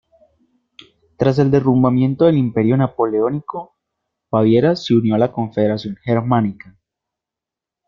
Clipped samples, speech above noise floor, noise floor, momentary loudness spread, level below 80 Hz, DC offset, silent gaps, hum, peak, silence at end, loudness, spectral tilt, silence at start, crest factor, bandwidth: under 0.1%; 70 dB; -86 dBFS; 8 LU; -54 dBFS; under 0.1%; none; none; -2 dBFS; 1.35 s; -17 LUFS; -9 dB/octave; 1.2 s; 16 dB; 7.2 kHz